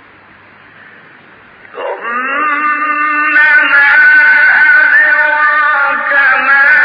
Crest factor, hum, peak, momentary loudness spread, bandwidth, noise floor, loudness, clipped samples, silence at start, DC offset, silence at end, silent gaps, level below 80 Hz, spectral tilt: 10 dB; none; 0 dBFS; 10 LU; 5.2 kHz; -40 dBFS; -7 LUFS; under 0.1%; 1.75 s; under 0.1%; 0 s; none; -58 dBFS; -3.5 dB/octave